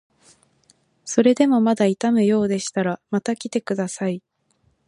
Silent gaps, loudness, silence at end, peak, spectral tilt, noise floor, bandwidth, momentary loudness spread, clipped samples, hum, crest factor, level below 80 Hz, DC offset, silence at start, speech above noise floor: none; -20 LUFS; 0.7 s; -2 dBFS; -5.5 dB/octave; -65 dBFS; 11.5 kHz; 10 LU; under 0.1%; none; 18 dB; -66 dBFS; under 0.1%; 1.05 s; 45 dB